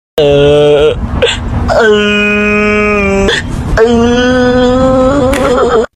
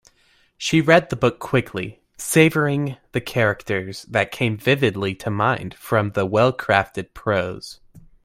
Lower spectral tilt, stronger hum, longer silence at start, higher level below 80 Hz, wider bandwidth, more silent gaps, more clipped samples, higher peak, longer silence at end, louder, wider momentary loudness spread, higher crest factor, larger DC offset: about the same, -5.5 dB/octave vs -5.5 dB/octave; neither; second, 0.15 s vs 0.6 s; first, -22 dBFS vs -52 dBFS; second, 14.5 kHz vs 16 kHz; neither; neither; about the same, 0 dBFS vs 0 dBFS; second, 0.1 s vs 0.25 s; first, -8 LUFS vs -20 LUFS; second, 5 LU vs 13 LU; second, 8 dB vs 20 dB; neither